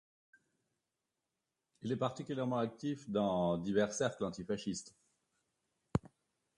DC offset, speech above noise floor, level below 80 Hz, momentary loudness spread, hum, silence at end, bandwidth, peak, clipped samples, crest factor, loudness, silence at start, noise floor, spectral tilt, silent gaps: under 0.1%; 53 dB; -66 dBFS; 8 LU; none; 0.5 s; 11.5 kHz; -18 dBFS; under 0.1%; 22 dB; -37 LUFS; 1.85 s; -89 dBFS; -5.5 dB/octave; none